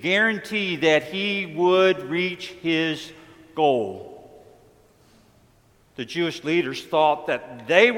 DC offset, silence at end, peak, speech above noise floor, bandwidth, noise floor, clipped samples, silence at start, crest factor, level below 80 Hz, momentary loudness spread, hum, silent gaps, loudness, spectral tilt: under 0.1%; 0 s; -2 dBFS; 36 dB; 15.5 kHz; -58 dBFS; under 0.1%; 0 s; 22 dB; -66 dBFS; 13 LU; none; none; -22 LUFS; -5 dB/octave